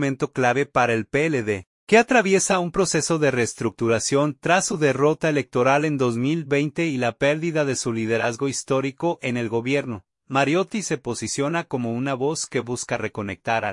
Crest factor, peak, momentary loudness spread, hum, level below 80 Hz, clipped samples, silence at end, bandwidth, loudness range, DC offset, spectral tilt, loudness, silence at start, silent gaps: 18 dB; -4 dBFS; 8 LU; none; -58 dBFS; under 0.1%; 0 s; 11.5 kHz; 4 LU; under 0.1%; -4.5 dB/octave; -22 LUFS; 0 s; 1.67-1.87 s